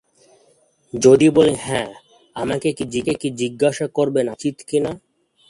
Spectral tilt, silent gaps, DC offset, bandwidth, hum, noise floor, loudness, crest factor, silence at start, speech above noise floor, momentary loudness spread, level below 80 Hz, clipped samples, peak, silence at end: -5.5 dB/octave; none; under 0.1%; 11.5 kHz; none; -58 dBFS; -19 LUFS; 18 dB; 0.95 s; 40 dB; 15 LU; -54 dBFS; under 0.1%; 0 dBFS; 0.55 s